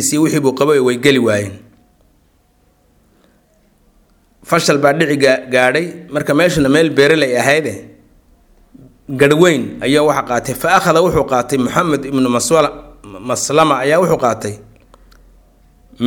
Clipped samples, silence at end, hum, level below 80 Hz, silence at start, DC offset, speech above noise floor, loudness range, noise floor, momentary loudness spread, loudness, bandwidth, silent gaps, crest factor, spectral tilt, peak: under 0.1%; 0 s; none; -46 dBFS; 0 s; under 0.1%; 42 dB; 5 LU; -55 dBFS; 10 LU; -13 LUFS; 19.5 kHz; none; 14 dB; -4.5 dB/octave; 0 dBFS